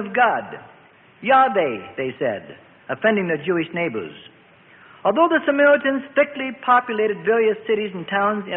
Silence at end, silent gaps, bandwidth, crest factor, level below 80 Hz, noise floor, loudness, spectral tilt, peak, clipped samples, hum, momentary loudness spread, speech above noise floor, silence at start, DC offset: 0 s; none; 4 kHz; 16 dB; -66 dBFS; -50 dBFS; -20 LUFS; -10 dB/octave; -4 dBFS; under 0.1%; none; 13 LU; 30 dB; 0 s; under 0.1%